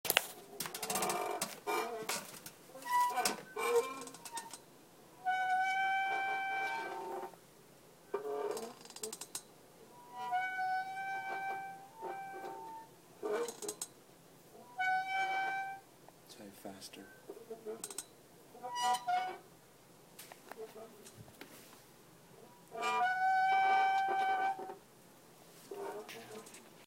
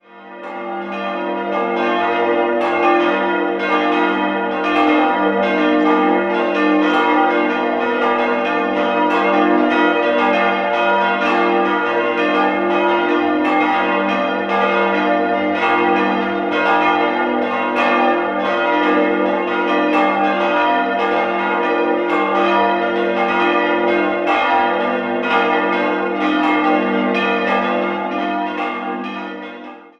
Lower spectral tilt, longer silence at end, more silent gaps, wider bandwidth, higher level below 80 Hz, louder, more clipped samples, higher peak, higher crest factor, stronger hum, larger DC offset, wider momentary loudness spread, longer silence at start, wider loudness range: second, -1.5 dB/octave vs -6 dB/octave; second, 0 s vs 0.15 s; neither; first, 16 kHz vs 7.4 kHz; second, -80 dBFS vs -56 dBFS; second, -37 LUFS vs -16 LUFS; neither; second, -6 dBFS vs -2 dBFS; first, 34 dB vs 14 dB; neither; neither; first, 21 LU vs 6 LU; about the same, 0.05 s vs 0.15 s; first, 11 LU vs 2 LU